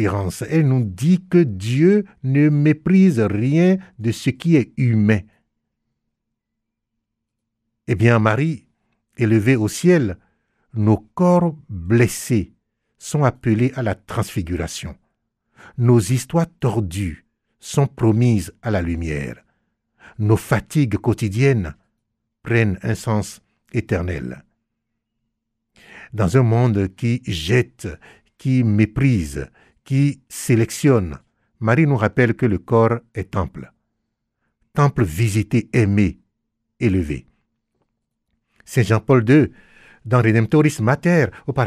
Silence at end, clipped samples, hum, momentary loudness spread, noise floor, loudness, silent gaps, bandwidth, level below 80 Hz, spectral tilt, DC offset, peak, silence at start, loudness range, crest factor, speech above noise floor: 0 s; under 0.1%; none; 12 LU; -79 dBFS; -19 LUFS; none; 14.5 kHz; -44 dBFS; -7 dB/octave; under 0.1%; -2 dBFS; 0 s; 6 LU; 16 dB; 61 dB